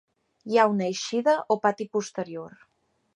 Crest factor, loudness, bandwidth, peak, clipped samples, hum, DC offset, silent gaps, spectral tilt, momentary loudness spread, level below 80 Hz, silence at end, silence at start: 20 dB; -25 LUFS; 11 kHz; -6 dBFS; under 0.1%; none; under 0.1%; none; -4.5 dB/octave; 17 LU; -76 dBFS; 0.65 s; 0.45 s